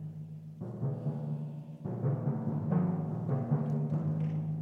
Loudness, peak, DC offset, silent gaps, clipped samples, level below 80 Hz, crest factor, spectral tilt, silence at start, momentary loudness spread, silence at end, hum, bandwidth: -34 LUFS; -18 dBFS; under 0.1%; none; under 0.1%; -68 dBFS; 16 dB; -11.5 dB/octave; 0 s; 12 LU; 0 s; none; 2.9 kHz